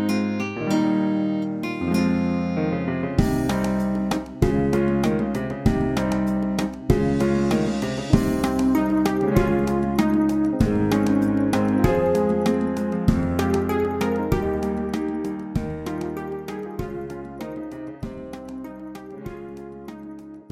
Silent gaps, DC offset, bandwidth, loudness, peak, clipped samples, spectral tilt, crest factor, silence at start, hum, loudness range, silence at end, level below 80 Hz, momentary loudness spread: none; under 0.1%; 16 kHz; -23 LUFS; -2 dBFS; under 0.1%; -7 dB/octave; 20 dB; 0 s; none; 12 LU; 0.1 s; -36 dBFS; 15 LU